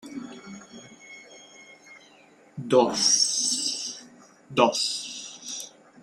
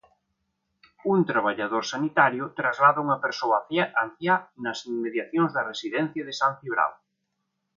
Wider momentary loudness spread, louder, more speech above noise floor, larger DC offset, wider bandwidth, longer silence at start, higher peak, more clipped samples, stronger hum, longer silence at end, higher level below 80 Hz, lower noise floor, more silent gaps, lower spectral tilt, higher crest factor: first, 25 LU vs 9 LU; about the same, -24 LUFS vs -25 LUFS; second, 34 dB vs 54 dB; neither; first, 16 kHz vs 7.6 kHz; second, 0.05 s vs 1.05 s; about the same, -4 dBFS vs -6 dBFS; neither; neither; second, 0.35 s vs 0.85 s; about the same, -72 dBFS vs -74 dBFS; second, -55 dBFS vs -79 dBFS; neither; second, -2 dB/octave vs -5 dB/octave; about the same, 24 dB vs 20 dB